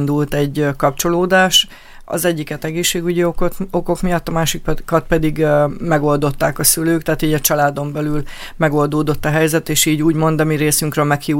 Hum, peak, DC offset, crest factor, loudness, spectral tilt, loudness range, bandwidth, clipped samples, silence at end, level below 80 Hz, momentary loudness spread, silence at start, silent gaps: none; 0 dBFS; under 0.1%; 16 dB; -16 LUFS; -4 dB/octave; 2 LU; 17 kHz; under 0.1%; 0 s; -32 dBFS; 8 LU; 0 s; none